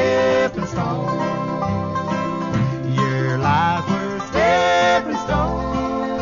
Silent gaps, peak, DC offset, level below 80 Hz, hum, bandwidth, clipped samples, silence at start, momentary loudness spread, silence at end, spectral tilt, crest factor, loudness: none; -4 dBFS; under 0.1%; -38 dBFS; none; 7.4 kHz; under 0.1%; 0 s; 7 LU; 0 s; -6 dB/octave; 14 dB; -20 LUFS